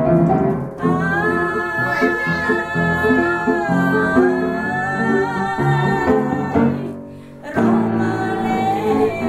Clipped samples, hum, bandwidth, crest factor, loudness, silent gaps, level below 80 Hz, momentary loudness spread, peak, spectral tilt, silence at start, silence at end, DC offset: under 0.1%; none; 14.5 kHz; 16 dB; -18 LUFS; none; -44 dBFS; 5 LU; -2 dBFS; -7.5 dB/octave; 0 s; 0 s; under 0.1%